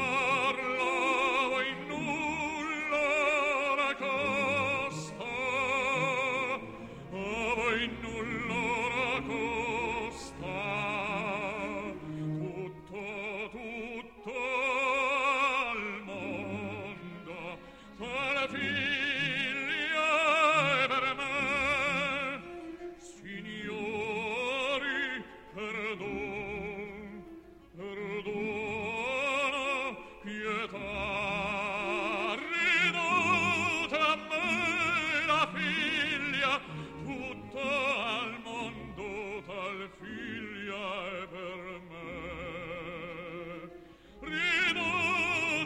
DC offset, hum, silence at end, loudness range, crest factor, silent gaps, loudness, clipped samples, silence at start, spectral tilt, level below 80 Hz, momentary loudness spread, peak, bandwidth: under 0.1%; none; 0 s; 10 LU; 18 dB; none; -31 LUFS; under 0.1%; 0 s; -4 dB/octave; -58 dBFS; 15 LU; -14 dBFS; 16 kHz